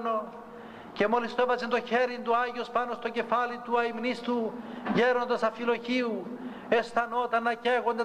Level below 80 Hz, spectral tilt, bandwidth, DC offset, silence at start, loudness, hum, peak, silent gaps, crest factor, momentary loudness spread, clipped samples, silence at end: -70 dBFS; -5.5 dB/octave; 10 kHz; under 0.1%; 0 s; -29 LUFS; none; -12 dBFS; none; 16 dB; 10 LU; under 0.1%; 0 s